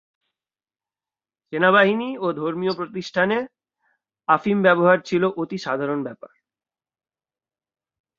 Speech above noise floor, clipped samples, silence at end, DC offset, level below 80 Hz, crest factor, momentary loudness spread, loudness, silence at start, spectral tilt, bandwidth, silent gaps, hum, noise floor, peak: over 70 dB; under 0.1%; 1.9 s; under 0.1%; -68 dBFS; 22 dB; 13 LU; -21 LUFS; 1.5 s; -6.5 dB/octave; 7.4 kHz; none; none; under -90 dBFS; -2 dBFS